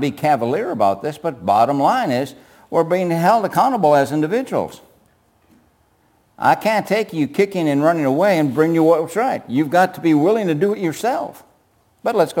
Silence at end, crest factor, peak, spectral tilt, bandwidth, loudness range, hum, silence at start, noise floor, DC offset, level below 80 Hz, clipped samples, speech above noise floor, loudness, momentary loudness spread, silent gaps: 0 s; 16 dB; -2 dBFS; -6.5 dB/octave; 17 kHz; 4 LU; none; 0 s; -59 dBFS; under 0.1%; -64 dBFS; under 0.1%; 42 dB; -18 LUFS; 8 LU; none